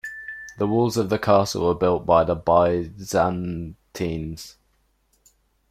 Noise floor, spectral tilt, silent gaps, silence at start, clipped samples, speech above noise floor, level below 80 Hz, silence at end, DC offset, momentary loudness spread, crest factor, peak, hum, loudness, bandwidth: -66 dBFS; -6 dB/octave; none; 0.05 s; under 0.1%; 45 dB; -48 dBFS; 1.2 s; under 0.1%; 16 LU; 20 dB; -4 dBFS; none; -22 LUFS; 16 kHz